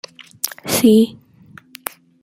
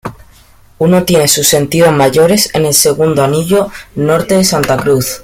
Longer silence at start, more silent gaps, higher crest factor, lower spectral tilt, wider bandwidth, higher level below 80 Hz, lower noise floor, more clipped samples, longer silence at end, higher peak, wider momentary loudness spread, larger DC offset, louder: first, 0.45 s vs 0.05 s; neither; first, 20 dB vs 10 dB; about the same, -4.5 dB/octave vs -4 dB/octave; second, 17 kHz vs over 20 kHz; second, -58 dBFS vs -40 dBFS; about the same, -45 dBFS vs -42 dBFS; neither; first, 1.1 s vs 0 s; about the same, 0 dBFS vs 0 dBFS; first, 18 LU vs 5 LU; neither; second, -16 LUFS vs -10 LUFS